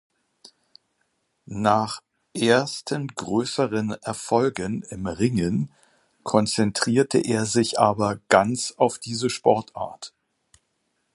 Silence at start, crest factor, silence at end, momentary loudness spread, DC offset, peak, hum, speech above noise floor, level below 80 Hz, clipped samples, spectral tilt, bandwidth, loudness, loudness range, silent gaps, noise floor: 1.5 s; 22 dB; 1.05 s; 14 LU; under 0.1%; -2 dBFS; none; 50 dB; -56 dBFS; under 0.1%; -4.5 dB/octave; 11.5 kHz; -23 LUFS; 4 LU; none; -73 dBFS